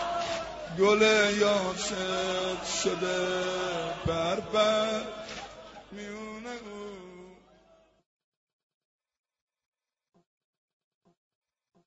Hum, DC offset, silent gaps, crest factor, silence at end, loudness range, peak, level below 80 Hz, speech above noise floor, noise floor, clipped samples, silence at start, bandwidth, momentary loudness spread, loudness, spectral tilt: none; under 0.1%; none; 20 dB; 4.5 s; 18 LU; -10 dBFS; -58 dBFS; 34 dB; -62 dBFS; under 0.1%; 0 s; 8 kHz; 20 LU; -28 LUFS; -3.5 dB/octave